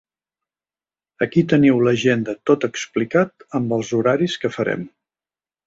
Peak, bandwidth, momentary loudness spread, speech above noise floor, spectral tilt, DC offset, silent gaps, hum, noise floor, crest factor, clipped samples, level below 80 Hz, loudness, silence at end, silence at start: -2 dBFS; 7.8 kHz; 9 LU; over 72 dB; -6 dB/octave; under 0.1%; none; none; under -90 dBFS; 18 dB; under 0.1%; -58 dBFS; -19 LUFS; 0.8 s; 1.2 s